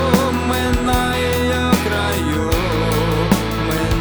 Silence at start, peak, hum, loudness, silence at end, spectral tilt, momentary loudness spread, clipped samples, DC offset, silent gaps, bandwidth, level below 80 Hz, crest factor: 0 s; 0 dBFS; none; -17 LUFS; 0 s; -5 dB/octave; 2 LU; under 0.1%; under 0.1%; none; over 20 kHz; -26 dBFS; 16 dB